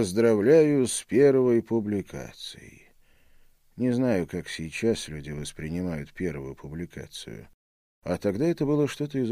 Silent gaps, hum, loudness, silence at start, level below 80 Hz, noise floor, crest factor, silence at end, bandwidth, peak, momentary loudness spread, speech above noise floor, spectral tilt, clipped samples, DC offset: 7.54-8.02 s; none; -25 LUFS; 0 s; -54 dBFS; -58 dBFS; 18 dB; 0 s; 15.5 kHz; -8 dBFS; 19 LU; 32 dB; -6 dB/octave; under 0.1%; under 0.1%